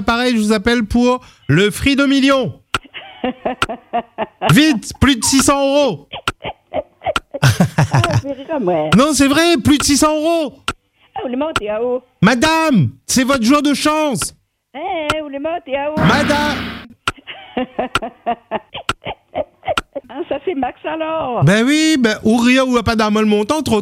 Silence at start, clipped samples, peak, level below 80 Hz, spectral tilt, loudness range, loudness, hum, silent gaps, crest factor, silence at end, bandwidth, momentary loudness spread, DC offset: 0 s; under 0.1%; 0 dBFS; -40 dBFS; -4.5 dB/octave; 7 LU; -16 LUFS; none; none; 16 dB; 0 s; 16.5 kHz; 12 LU; under 0.1%